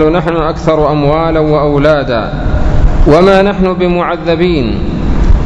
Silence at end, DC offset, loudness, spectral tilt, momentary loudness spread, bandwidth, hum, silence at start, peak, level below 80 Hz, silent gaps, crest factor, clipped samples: 0 s; under 0.1%; -10 LUFS; -8 dB/octave; 7 LU; 7.8 kHz; none; 0 s; 0 dBFS; -14 dBFS; none; 8 dB; 2%